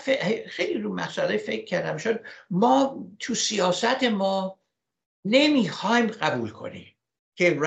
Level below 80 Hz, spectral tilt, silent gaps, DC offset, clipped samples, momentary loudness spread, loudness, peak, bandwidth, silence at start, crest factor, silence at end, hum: -72 dBFS; -4 dB/octave; 5.06-5.23 s, 7.19-7.32 s; under 0.1%; under 0.1%; 13 LU; -24 LUFS; -6 dBFS; 9 kHz; 0 s; 20 dB; 0 s; none